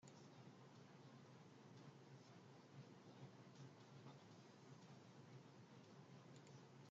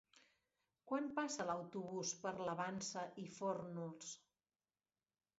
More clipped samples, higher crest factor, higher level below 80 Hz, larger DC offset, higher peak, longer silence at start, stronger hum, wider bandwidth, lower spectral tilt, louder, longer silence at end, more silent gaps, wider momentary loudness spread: neither; about the same, 16 dB vs 18 dB; about the same, under -90 dBFS vs -86 dBFS; neither; second, -48 dBFS vs -28 dBFS; second, 0 s vs 0.15 s; neither; about the same, 7.6 kHz vs 7.6 kHz; about the same, -5.5 dB/octave vs -4.5 dB/octave; second, -64 LUFS vs -45 LUFS; second, 0 s vs 1.25 s; neither; second, 2 LU vs 8 LU